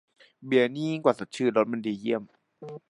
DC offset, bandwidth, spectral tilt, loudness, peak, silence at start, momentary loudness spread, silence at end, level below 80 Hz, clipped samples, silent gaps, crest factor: under 0.1%; 11 kHz; -6 dB/octave; -27 LUFS; -6 dBFS; 0.4 s; 17 LU; 0.1 s; -76 dBFS; under 0.1%; none; 22 dB